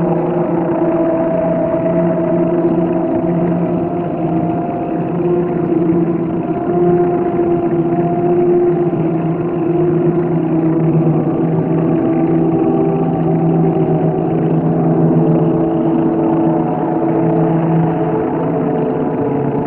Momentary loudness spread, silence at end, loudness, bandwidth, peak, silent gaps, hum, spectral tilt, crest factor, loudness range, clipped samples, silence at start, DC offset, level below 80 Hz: 4 LU; 0 s; -15 LUFS; 3.2 kHz; -2 dBFS; none; none; -13 dB/octave; 12 dB; 2 LU; under 0.1%; 0 s; under 0.1%; -44 dBFS